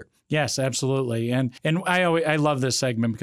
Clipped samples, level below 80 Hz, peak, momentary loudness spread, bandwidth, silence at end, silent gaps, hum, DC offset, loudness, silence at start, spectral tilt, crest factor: under 0.1%; -64 dBFS; -6 dBFS; 4 LU; 15 kHz; 0 s; none; none; under 0.1%; -23 LUFS; 0 s; -5 dB/octave; 18 dB